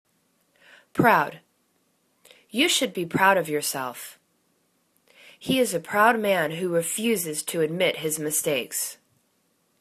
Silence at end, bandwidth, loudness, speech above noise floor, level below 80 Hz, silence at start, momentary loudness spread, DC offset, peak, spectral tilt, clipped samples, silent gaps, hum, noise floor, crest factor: 0.85 s; 14 kHz; -23 LUFS; 45 dB; -66 dBFS; 0.95 s; 12 LU; under 0.1%; -4 dBFS; -3 dB/octave; under 0.1%; none; none; -69 dBFS; 22 dB